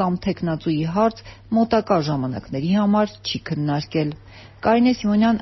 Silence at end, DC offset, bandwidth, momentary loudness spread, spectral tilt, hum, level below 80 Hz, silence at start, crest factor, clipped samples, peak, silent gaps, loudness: 0 s; under 0.1%; 6.2 kHz; 8 LU; -6 dB/octave; none; -48 dBFS; 0 s; 16 dB; under 0.1%; -6 dBFS; none; -21 LUFS